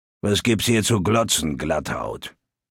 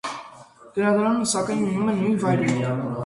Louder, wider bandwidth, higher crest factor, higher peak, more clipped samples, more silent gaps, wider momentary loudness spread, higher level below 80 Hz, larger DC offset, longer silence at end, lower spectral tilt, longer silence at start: about the same, -21 LUFS vs -22 LUFS; first, 17 kHz vs 11.5 kHz; about the same, 16 dB vs 16 dB; about the same, -6 dBFS vs -8 dBFS; neither; neither; first, 12 LU vs 9 LU; first, -44 dBFS vs -58 dBFS; neither; first, 0.4 s vs 0 s; second, -4 dB/octave vs -5.5 dB/octave; first, 0.25 s vs 0.05 s